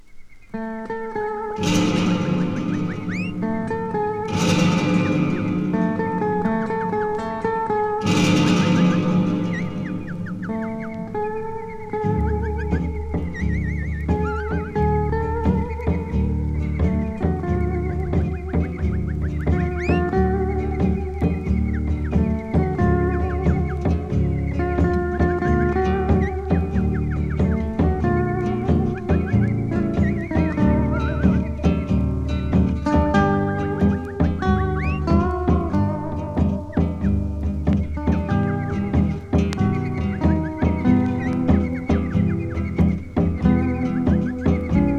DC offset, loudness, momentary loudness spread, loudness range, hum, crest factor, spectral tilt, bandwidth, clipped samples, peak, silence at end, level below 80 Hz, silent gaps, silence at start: under 0.1%; -22 LUFS; 6 LU; 3 LU; none; 16 dB; -7.5 dB/octave; 9.8 kHz; under 0.1%; -4 dBFS; 0 s; -28 dBFS; none; 0.05 s